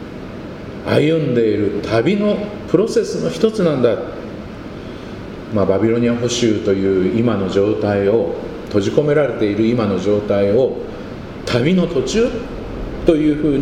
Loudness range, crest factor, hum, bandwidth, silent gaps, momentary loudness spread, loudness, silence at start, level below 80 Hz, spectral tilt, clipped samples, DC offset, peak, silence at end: 2 LU; 16 dB; none; 11 kHz; none; 15 LU; -17 LUFS; 0 s; -38 dBFS; -6.5 dB/octave; under 0.1%; under 0.1%; 0 dBFS; 0 s